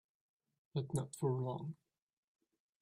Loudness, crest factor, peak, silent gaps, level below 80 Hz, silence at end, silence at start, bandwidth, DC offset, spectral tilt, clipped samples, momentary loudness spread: -41 LUFS; 20 dB; -24 dBFS; none; -76 dBFS; 1.05 s; 0.75 s; 13.5 kHz; under 0.1%; -7.5 dB/octave; under 0.1%; 11 LU